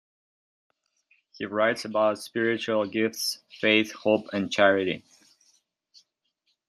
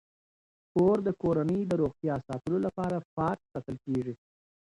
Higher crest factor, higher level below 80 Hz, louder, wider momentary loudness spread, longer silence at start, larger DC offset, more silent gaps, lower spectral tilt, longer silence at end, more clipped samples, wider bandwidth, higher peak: about the same, 22 dB vs 18 dB; second, -76 dBFS vs -58 dBFS; first, -25 LUFS vs -30 LUFS; second, 9 LU vs 12 LU; first, 1.4 s vs 0.75 s; neither; second, none vs 3.05-3.17 s; second, -4 dB/octave vs -9 dB/octave; first, 1.7 s vs 0.5 s; neither; first, 13.5 kHz vs 11 kHz; first, -6 dBFS vs -14 dBFS